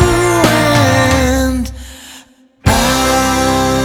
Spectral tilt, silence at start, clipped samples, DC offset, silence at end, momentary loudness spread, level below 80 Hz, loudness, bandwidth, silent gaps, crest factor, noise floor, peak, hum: -4.5 dB/octave; 0 s; under 0.1%; under 0.1%; 0 s; 14 LU; -24 dBFS; -12 LUFS; 19.5 kHz; none; 12 dB; -42 dBFS; 0 dBFS; none